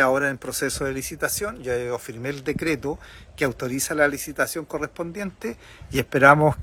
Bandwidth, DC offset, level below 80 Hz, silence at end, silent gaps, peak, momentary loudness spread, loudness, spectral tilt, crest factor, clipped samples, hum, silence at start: 18 kHz; under 0.1%; -48 dBFS; 0 s; none; 0 dBFS; 14 LU; -24 LUFS; -4.5 dB/octave; 24 dB; under 0.1%; none; 0 s